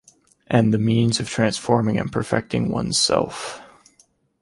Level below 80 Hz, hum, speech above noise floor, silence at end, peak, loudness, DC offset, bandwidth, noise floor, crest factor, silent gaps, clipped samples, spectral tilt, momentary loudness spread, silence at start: -50 dBFS; none; 40 dB; 0.75 s; -4 dBFS; -21 LUFS; under 0.1%; 11.5 kHz; -60 dBFS; 18 dB; none; under 0.1%; -5 dB/octave; 9 LU; 0.5 s